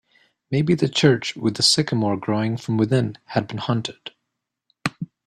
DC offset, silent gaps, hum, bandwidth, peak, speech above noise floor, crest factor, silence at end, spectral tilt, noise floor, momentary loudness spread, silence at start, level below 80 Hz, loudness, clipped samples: under 0.1%; none; none; 13 kHz; -2 dBFS; 60 dB; 20 dB; 0.2 s; -5 dB/octave; -80 dBFS; 12 LU; 0.5 s; -58 dBFS; -21 LUFS; under 0.1%